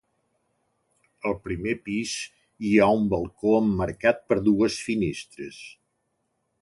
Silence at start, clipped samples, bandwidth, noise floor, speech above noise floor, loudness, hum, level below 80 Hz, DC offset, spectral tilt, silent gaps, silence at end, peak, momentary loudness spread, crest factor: 1.25 s; under 0.1%; 11.5 kHz; -75 dBFS; 51 dB; -24 LUFS; none; -50 dBFS; under 0.1%; -5.5 dB/octave; none; 0.9 s; -6 dBFS; 18 LU; 20 dB